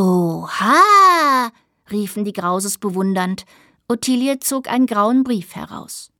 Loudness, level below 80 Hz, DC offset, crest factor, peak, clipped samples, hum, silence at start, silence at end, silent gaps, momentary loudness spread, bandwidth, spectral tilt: -16 LUFS; -62 dBFS; under 0.1%; 16 dB; -2 dBFS; under 0.1%; none; 0 s; 0.15 s; none; 16 LU; 18.5 kHz; -4.5 dB/octave